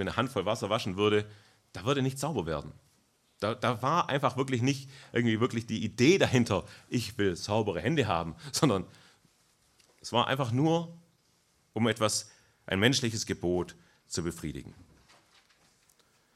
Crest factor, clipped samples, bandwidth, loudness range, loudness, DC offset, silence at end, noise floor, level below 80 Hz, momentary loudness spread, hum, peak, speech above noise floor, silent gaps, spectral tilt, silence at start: 22 dB; under 0.1%; 14 kHz; 4 LU; -30 LUFS; under 0.1%; 1.65 s; -69 dBFS; -62 dBFS; 12 LU; none; -8 dBFS; 40 dB; none; -5 dB/octave; 0 s